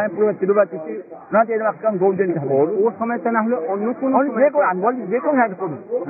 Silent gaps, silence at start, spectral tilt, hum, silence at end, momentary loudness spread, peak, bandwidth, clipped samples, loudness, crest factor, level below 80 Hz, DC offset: none; 0 s; -14 dB/octave; none; 0 s; 6 LU; -4 dBFS; 2.7 kHz; under 0.1%; -19 LUFS; 14 dB; -76 dBFS; under 0.1%